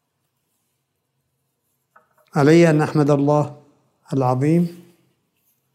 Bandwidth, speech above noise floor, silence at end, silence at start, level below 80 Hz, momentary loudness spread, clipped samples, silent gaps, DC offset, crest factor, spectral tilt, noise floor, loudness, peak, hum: 14 kHz; 57 dB; 1 s; 2.35 s; -70 dBFS; 13 LU; under 0.1%; none; under 0.1%; 18 dB; -7.5 dB/octave; -73 dBFS; -18 LUFS; -2 dBFS; none